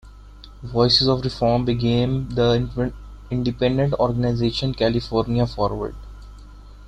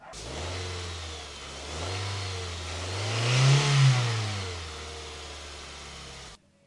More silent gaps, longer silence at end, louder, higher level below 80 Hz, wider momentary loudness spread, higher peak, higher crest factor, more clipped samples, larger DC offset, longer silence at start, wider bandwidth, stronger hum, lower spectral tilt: neither; second, 0 s vs 0.3 s; first, -21 LUFS vs -28 LUFS; first, -38 dBFS vs -50 dBFS; second, 11 LU vs 19 LU; first, -4 dBFS vs -10 dBFS; about the same, 18 dB vs 20 dB; neither; neither; about the same, 0.05 s vs 0 s; second, 9.2 kHz vs 11.5 kHz; first, 50 Hz at -35 dBFS vs none; first, -7 dB/octave vs -4.5 dB/octave